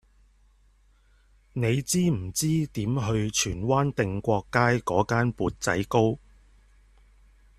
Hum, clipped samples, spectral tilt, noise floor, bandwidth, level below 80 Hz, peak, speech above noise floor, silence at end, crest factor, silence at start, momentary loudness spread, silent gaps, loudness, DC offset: none; under 0.1%; -5 dB/octave; -61 dBFS; 14.5 kHz; -50 dBFS; -6 dBFS; 35 dB; 1.4 s; 22 dB; 1.55 s; 5 LU; none; -26 LUFS; under 0.1%